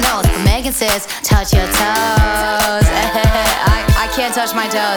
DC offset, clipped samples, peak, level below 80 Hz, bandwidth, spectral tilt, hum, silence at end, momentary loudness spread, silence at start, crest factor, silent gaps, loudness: under 0.1%; under 0.1%; -2 dBFS; -20 dBFS; over 20 kHz; -4 dB/octave; none; 0 s; 3 LU; 0 s; 12 dB; none; -14 LUFS